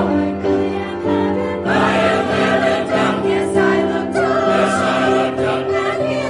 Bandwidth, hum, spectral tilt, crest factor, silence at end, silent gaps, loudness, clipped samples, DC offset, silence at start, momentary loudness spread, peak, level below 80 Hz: 11 kHz; none; -5.5 dB/octave; 14 dB; 0 s; none; -16 LUFS; under 0.1%; under 0.1%; 0 s; 4 LU; -2 dBFS; -52 dBFS